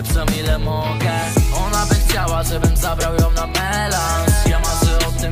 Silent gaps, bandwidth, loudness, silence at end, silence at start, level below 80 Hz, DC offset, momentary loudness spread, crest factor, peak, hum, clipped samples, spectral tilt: none; 16 kHz; -18 LUFS; 0 s; 0 s; -20 dBFS; under 0.1%; 3 LU; 14 dB; -4 dBFS; none; under 0.1%; -4.5 dB/octave